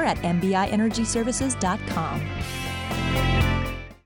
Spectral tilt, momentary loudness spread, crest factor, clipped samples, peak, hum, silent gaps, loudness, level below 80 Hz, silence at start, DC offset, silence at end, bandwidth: -5 dB/octave; 7 LU; 14 dB; under 0.1%; -10 dBFS; none; none; -25 LUFS; -34 dBFS; 0 s; under 0.1%; 0.1 s; 19.5 kHz